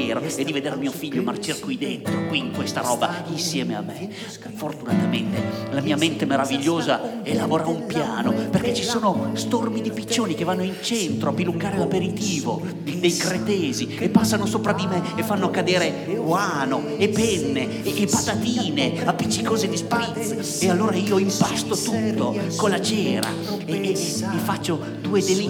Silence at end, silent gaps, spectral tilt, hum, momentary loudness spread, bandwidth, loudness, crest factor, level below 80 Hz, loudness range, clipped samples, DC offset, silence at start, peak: 0 s; none; -4.5 dB/octave; none; 6 LU; 18.5 kHz; -23 LUFS; 20 dB; -56 dBFS; 3 LU; under 0.1%; under 0.1%; 0 s; -2 dBFS